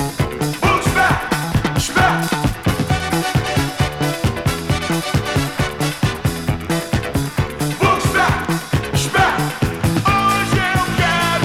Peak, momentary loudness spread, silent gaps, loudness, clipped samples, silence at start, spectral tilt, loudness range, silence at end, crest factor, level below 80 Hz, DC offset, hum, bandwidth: -6 dBFS; 6 LU; none; -18 LUFS; under 0.1%; 0 s; -4.5 dB/octave; 3 LU; 0 s; 12 dB; -32 dBFS; under 0.1%; none; 17 kHz